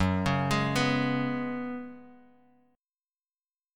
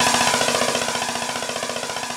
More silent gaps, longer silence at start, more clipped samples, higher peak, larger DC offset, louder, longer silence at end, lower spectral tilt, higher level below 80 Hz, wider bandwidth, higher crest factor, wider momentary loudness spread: neither; about the same, 0 s vs 0 s; neither; second, -12 dBFS vs -4 dBFS; neither; second, -29 LUFS vs -21 LUFS; first, 1.6 s vs 0 s; first, -6 dB/octave vs -1 dB/octave; about the same, -52 dBFS vs -56 dBFS; about the same, 17 kHz vs 18.5 kHz; about the same, 18 dB vs 18 dB; first, 12 LU vs 8 LU